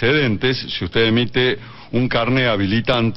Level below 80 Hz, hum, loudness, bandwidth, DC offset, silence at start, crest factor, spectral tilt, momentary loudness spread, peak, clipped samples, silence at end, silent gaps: -42 dBFS; none; -18 LUFS; 6 kHz; under 0.1%; 0 s; 14 dB; -7.5 dB/octave; 6 LU; -4 dBFS; under 0.1%; 0 s; none